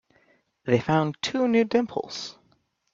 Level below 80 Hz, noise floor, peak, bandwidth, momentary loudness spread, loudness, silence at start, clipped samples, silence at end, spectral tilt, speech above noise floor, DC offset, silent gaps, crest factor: -64 dBFS; -67 dBFS; -6 dBFS; 7.6 kHz; 14 LU; -25 LUFS; 0.65 s; under 0.1%; 0.6 s; -6 dB/octave; 43 dB; under 0.1%; none; 20 dB